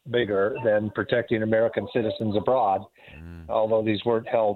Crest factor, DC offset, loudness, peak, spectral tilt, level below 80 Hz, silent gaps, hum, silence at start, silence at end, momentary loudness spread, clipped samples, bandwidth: 16 dB; under 0.1%; -24 LUFS; -8 dBFS; -8.5 dB/octave; -56 dBFS; none; none; 0.05 s; 0 s; 5 LU; under 0.1%; 4.4 kHz